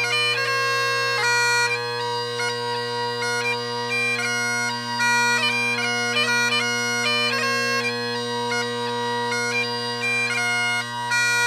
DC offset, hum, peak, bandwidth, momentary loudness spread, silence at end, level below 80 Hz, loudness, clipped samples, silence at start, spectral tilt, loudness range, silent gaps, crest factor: under 0.1%; none; -10 dBFS; 15.5 kHz; 6 LU; 0 s; -76 dBFS; -21 LUFS; under 0.1%; 0 s; -2 dB/octave; 3 LU; none; 14 dB